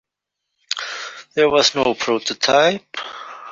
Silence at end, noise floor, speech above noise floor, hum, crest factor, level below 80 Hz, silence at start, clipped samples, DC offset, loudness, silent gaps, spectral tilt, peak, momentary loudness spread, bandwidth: 0 s; -80 dBFS; 63 dB; none; 18 dB; -58 dBFS; 0.7 s; under 0.1%; under 0.1%; -18 LUFS; none; -2.5 dB/octave; -2 dBFS; 16 LU; 7.8 kHz